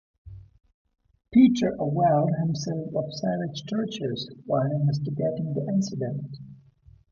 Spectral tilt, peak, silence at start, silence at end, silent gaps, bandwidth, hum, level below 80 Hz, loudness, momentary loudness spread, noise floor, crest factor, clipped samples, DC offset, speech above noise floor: -7.5 dB/octave; -8 dBFS; 0.25 s; 0.55 s; 0.74-0.85 s; 7.4 kHz; none; -58 dBFS; -26 LUFS; 11 LU; -55 dBFS; 18 dB; under 0.1%; under 0.1%; 31 dB